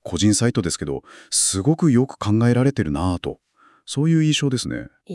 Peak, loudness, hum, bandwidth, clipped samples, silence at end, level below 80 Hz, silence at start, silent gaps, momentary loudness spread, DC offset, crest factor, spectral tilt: -6 dBFS; -20 LUFS; none; 12 kHz; under 0.1%; 0 s; -48 dBFS; 0.05 s; none; 12 LU; under 0.1%; 14 dB; -5 dB/octave